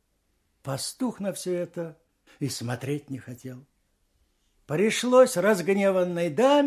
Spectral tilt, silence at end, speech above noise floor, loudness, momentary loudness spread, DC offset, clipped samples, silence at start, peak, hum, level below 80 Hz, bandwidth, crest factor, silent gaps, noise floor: -5 dB/octave; 0 s; 47 dB; -25 LUFS; 19 LU; under 0.1%; under 0.1%; 0.65 s; -6 dBFS; none; -68 dBFS; 15.5 kHz; 20 dB; none; -72 dBFS